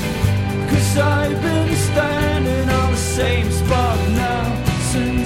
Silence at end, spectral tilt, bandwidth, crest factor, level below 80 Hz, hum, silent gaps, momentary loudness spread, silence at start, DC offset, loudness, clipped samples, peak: 0 s; -5.5 dB/octave; 16.5 kHz; 14 dB; -28 dBFS; none; none; 3 LU; 0 s; 0.6%; -18 LUFS; under 0.1%; -4 dBFS